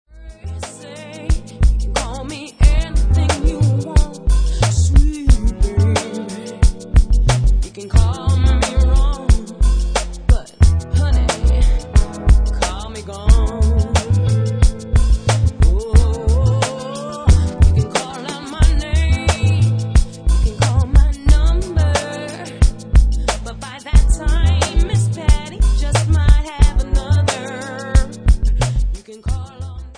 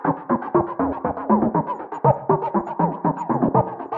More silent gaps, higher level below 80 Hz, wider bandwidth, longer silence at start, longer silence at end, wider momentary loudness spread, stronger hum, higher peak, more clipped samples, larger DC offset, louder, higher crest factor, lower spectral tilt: neither; first, -16 dBFS vs -52 dBFS; first, 10 kHz vs 7.2 kHz; first, 0.15 s vs 0 s; about the same, 0.05 s vs 0 s; first, 11 LU vs 5 LU; neither; first, 0 dBFS vs -4 dBFS; neither; neither; first, -17 LUFS vs -22 LUFS; about the same, 14 dB vs 18 dB; second, -5.5 dB/octave vs -11 dB/octave